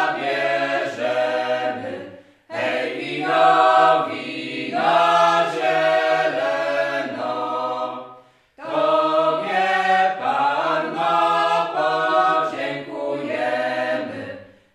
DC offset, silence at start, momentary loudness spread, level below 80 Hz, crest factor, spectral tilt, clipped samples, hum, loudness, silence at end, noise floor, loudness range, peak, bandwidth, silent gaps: under 0.1%; 0 s; 12 LU; -74 dBFS; 18 dB; -4.5 dB/octave; under 0.1%; none; -20 LUFS; 0.3 s; -47 dBFS; 5 LU; -2 dBFS; 11.5 kHz; none